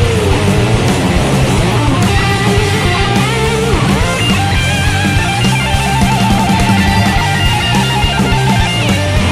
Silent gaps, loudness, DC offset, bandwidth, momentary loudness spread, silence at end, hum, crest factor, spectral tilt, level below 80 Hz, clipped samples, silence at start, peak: none; -11 LUFS; under 0.1%; 15 kHz; 1 LU; 0 s; none; 10 dB; -5 dB/octave; -22 dBFS; under 0.1%; 0 s; 0 dBFS